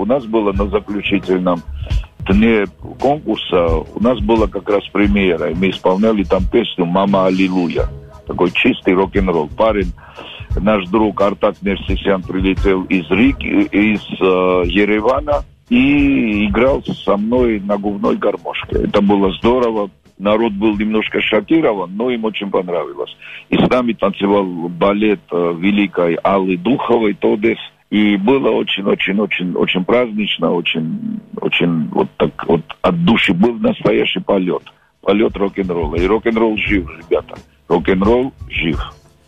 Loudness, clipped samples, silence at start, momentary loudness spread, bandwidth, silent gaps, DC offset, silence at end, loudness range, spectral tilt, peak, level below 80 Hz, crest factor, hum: -16 LUFS; under 0.1%; 0 s; 7 LU; 8.2 kHz; none; under 0.1%; 0.35 s; 2 LU; -7.5 dB/octave; -2 dBFS; -30 dBFS; 12 dB; none